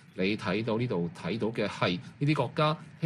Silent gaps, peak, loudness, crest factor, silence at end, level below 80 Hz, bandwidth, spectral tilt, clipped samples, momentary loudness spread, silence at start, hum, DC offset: none; -14 dBFS; -30 LUFS; 16 dB; 0 s; -66 dBFS; 11.5 kHz; -7 dB/octave; under 0.1%; 4 LU; 0.15 s; none; under 0.1%